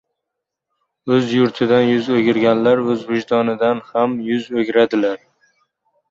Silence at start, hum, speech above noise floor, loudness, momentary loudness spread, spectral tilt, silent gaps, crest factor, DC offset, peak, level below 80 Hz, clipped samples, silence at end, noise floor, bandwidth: 1.05 s; none; 64 dB; -17 LUFS; 6 LU; -7 dB/octave; none; 16 dB; under 0.1%; -2 dBFS; -60 dBFS; under 0.1%; 0.95 s; -80 dBFS; 7.6 kHz